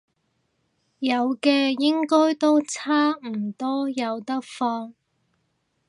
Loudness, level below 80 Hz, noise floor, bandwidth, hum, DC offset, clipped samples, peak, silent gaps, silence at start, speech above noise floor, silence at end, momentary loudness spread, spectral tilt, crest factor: -23 LUFS; -80 dBFS; -72 dBFS; 11 kHz; none; under 0.1%; under 0.1%; -6 dBFS; none; 1 s; 50 dB; 0.95 s; 10 LU; -4 dB/octave; 18 dB